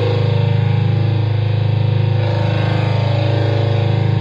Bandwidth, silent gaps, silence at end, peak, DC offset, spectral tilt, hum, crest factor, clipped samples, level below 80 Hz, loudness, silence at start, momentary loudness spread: 5.4 kHz; none; 0 s; -6 dBFS; under 0.1%; -8.5 dB/octave; none; 10 dB; under 0.1%; -44 dBFS; -16 LUFS; 0 s; 1 LU